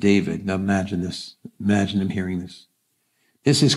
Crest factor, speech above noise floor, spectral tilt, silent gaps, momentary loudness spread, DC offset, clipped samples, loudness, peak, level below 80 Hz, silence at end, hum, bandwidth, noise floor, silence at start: 18 dB; 49 dB; -5.5 dB/octave; none; 12 LU; under 0.1%; under 0.1%; -23 LUFS; -4 dBFS; -56 dBFS; 0 s; none; 12.5 kHz; -70 dBFS; 0 s